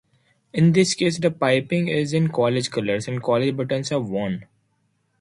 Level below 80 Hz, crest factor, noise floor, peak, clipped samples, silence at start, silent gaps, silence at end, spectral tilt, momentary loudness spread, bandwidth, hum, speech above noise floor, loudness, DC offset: -60 dBFS; 16 dB; -68 dBFS; -6 dBFS; under 0.1%; 0.55 s; none; 0.75 s; -5.5 dB/octave; 8 LU; 11.5 kHz; none; 47 dB; -22 LUFS; under 0.1%